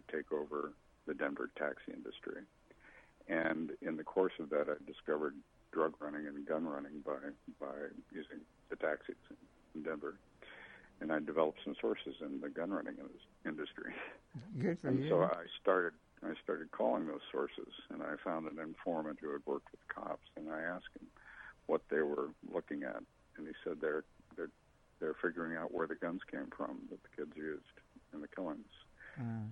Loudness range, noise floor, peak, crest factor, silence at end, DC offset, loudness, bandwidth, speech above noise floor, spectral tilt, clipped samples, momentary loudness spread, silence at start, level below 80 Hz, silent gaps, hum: 6 LU; -68 dBFS; -18 dBFS; 24 dB; 0 s; under 0.1%; -41 LUFS; 10 kHz; 28 dB; -8 dB/octave; under 0.1%; 16 LU; 0.1 s; -72 dBFS; none; none